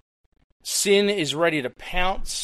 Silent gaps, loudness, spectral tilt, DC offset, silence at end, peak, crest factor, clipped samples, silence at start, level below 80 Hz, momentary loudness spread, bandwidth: none; -22 LUFS; -2.5 dB/octave; under 0.1%; 0 s; -6 dBFS; 16 dB; under 0.1%; 0.65 s; -36 dBFS; 9 LU; 15.5 kHz